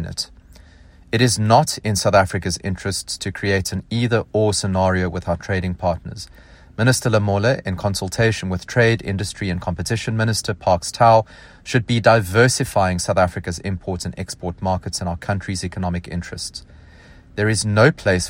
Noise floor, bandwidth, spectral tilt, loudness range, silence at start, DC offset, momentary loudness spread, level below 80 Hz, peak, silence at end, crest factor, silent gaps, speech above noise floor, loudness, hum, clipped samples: -46 dBFS; 16 kHz; -5 dB/octave; 7 LU; 0 s; under 0.1%; 13 LU; -44 dBFS; 0 dBFS; 0 s; 18 dB; none; 27 dB; -20 LUFS; none; under 0.1%